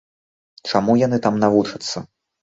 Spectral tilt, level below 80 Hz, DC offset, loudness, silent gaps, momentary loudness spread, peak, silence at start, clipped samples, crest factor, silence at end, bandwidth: -6 dB/octave; -58 dBFS; under 0.1%; -19 LUFS; none; 12 LU; -2 dBFS; 0.65 s; under 0.1%; 18 dB; 0.4 s; 8 kHz